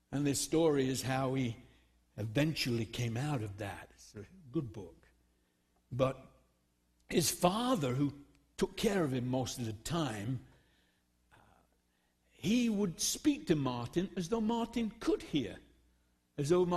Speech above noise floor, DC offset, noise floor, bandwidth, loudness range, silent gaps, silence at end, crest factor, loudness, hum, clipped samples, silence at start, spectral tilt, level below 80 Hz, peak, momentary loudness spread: 42 dB; under 0.1%; -76 dBFS; 13 kHz; 7 LU; none; 0 s; 24 dB; -35 LUFS; 60 Hz at -65 dBFS; under 0.1%; 0.1 s; -5 dB/octave; -60 dBFS; -12 dBFS; 17 LU